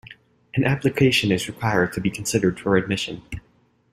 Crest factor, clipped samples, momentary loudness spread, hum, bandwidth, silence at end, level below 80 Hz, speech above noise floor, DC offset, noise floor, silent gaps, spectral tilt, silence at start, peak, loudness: 20 dB; under 0.1%; 12 LU; none; 15.5 kHz; 0.55 s; -50 dBFS; 26 dB; under 0.1%; -48 dBFS; none; -5 dB/octave; 0.1 s; -4 dBFS; -22 LUFS